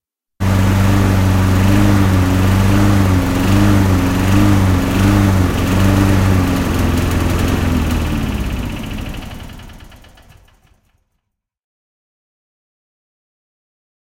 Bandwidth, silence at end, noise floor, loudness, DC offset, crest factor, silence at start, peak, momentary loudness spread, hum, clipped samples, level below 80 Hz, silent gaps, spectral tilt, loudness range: 16.5 kHz; 4.2 s; -72 dBFS; -14 LUFS; under 0.1%; 14 dB; 0.4 s; 0 dBFS; 11 LU; none; under 0.1%; -24 dBFS; none; -6.5 dB/octave; 13 LU